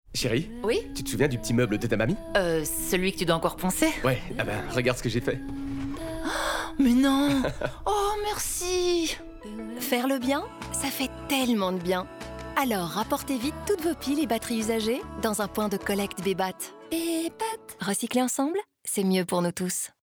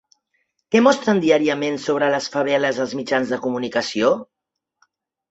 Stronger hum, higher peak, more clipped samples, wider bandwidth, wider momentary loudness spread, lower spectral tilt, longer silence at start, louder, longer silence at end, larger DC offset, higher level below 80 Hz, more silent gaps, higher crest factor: neither; second, -10 dBFS vs -2 dBFS; neither; first, over 20 kHz vs 8.2 kHz; about the same, 7 LU vs 7 LU; about the same, -4.5 dB/octave vs -4.5 dB/octave; second, 0.1 s vs 0.7 s; second, -27 LUFS vs -19 LUFS; second, 0.15 s vs 1.05 s; neither; first, -44 dBFS vs -64 dBFS; neither; about the same, 18 dB vs 18 dB